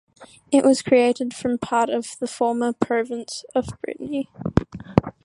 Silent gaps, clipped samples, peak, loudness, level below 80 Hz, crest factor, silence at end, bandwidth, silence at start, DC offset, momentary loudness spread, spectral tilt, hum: none; under 0.1%; 0 dBFS; -22 LUFS; -44 dBFS; 22 dB; 0.15 s; 11.5 kHz; 0.2 s; under 0.1%; 11 LU; -6 dB/octave; none